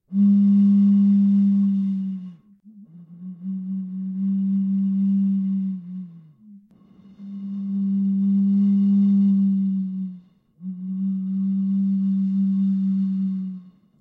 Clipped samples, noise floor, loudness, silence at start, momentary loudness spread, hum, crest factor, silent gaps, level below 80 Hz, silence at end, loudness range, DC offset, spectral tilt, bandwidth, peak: under 0.1%; -51 dBFS; -21 LUFS; 0.1 s; 18 LU; none; 10 dB; none; -76 dBFS; 0.3 s; 6 LU; under 0.1%; -12 dB/octave; 1.2 kHz; -12 dBFS